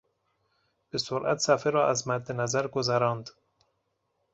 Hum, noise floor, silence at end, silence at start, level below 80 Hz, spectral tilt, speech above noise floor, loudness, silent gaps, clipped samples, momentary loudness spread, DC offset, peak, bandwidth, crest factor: none; -77 dBFS; 1.05 s; 0.95 s; -68 dBFS; -4 dB/octave; 50 dB; -28 LUFS; none; under 0.1%; 10 LU; under 0.1%; -8 dBFS; 8.2 kHz; 20 dB